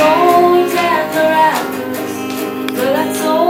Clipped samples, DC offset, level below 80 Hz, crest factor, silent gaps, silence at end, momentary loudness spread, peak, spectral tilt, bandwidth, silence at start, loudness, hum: under 0.1%; under 0.1%; -56 dBFS; 14 dB; none; 0 s; 11 LU; 0 dBFS; -4 dB/octave; 16.5 kHz; 0 s; -14 LUFS; none